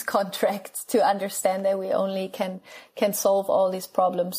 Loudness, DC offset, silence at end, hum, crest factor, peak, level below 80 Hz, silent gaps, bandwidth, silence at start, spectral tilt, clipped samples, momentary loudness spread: -25 LUFS; under 0.1%; 0 s; none; 16 dB; -8 dBFS; -74 dBFS; none; 15.5 kHz; 0 s; -4 dB/octave; under 0.1%; 10 LU